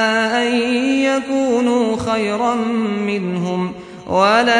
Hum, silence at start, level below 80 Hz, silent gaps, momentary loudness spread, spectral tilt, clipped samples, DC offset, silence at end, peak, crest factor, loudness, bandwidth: none; 0 s; -52 dBFS; none; 5 LU; -5 dB/octave; under 0.1%; under 0.1%; 0 s; -2 dBFS; 14 dB; -17 LUFS; 10.5 kHz